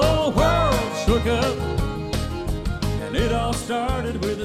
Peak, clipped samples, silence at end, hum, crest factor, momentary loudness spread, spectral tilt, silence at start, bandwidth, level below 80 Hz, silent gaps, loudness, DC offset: -6 dBFS; under 0.1%; 0 s; none; 16 dB; 8 LU; -5.5 dB/octave; 0 s; 15.5 kHz; -30 dBFS; none; -23 LUFS; under 0.1%